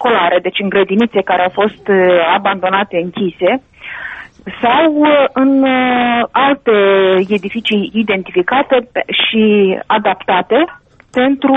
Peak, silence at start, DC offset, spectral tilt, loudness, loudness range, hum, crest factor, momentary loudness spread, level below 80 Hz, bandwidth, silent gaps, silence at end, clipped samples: 0 dBFS; 0 s; under 0.1%; -7 dB/octave; -12 LUFS; 3 LU; none; 12 dB; 8 LU; -52 dBFS; 5 kHz; none; 0 s; under 0.1%